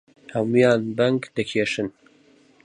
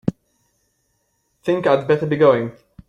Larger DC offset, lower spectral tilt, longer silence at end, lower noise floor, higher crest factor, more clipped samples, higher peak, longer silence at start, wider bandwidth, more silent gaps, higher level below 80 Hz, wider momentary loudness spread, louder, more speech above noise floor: neither; second, -6 dB/octave vs -8 dB/octave; first, 0.75 s vs 0.35 s; second, -56 dBFS vs -68 dBFS; about the same, 18 dB vs 18 dB; neither; second, -6 dBFS vs -2 dBFS; first, 0.3 s vs 0.05 s; about the same, 10.5 kHz vs 9.6 kHz; neither; second, -62 dBFS vs -56 dBFS; about the same, 11 LU vs 13 LU; second, -22 LUFS vs -18 LUFS; second, 35 dB vs 51 dB